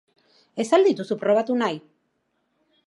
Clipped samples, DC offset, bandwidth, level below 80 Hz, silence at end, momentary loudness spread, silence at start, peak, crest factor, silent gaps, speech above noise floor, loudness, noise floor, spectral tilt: under 0.1%; under 0.1%; 11.5 kHz; -80 dBFS; 1.1 s; 15 LU; 0.55 s; -4 dBFS; 20 dB; none; 51 dB; -22 LUFS; -72 dBFS; -5 dB/octave